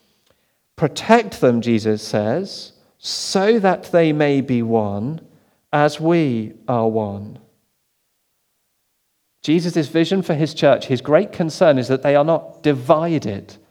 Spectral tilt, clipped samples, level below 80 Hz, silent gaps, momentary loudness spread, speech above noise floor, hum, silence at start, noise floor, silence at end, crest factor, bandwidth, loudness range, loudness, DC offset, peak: -6 dB/octave; under 0.1%; -62 dBFS; none; 12 LU; 51 dB; none; 0.8 s; -68 dBFS; 0.2 s; 18 dB; 17 kHz; 7 LU; -18 LUFS; under 0.1%; 0 dBFS